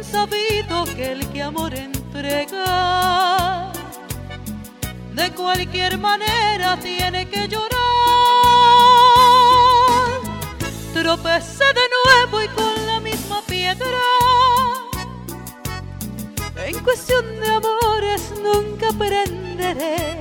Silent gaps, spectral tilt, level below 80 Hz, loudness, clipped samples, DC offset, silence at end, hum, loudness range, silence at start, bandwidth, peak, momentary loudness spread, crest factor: none; -3.5 dB/octave; -38 dBFS; -16 LUFS; under 0.1%; under 0.1%; 0 s; none; 9 LU; 0 s; over 20 kHz; 0 dBFS; 18 LU; 18 dB